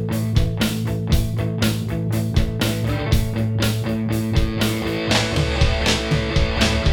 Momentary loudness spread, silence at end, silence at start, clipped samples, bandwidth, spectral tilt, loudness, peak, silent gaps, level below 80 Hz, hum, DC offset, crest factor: 4 LU; 0 s; 0 s; under 0.1%; 19.5 kHz; -5 dB/octave; -21 LUFS; -4 dBFS; none; -26 dBFS; none; under 0.1%; 16 dB